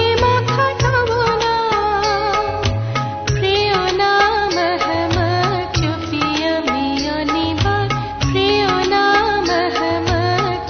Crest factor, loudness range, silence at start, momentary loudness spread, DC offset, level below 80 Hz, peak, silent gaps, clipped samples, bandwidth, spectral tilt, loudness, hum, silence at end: 14 dB; 2 LU; 0 s; 5 LU; under 0.1%; -34 dBFS; -2 dBFS; none; under 0.1%; 6.6 kHz; -5 dB/octave; -17 LUFS; none; 0 s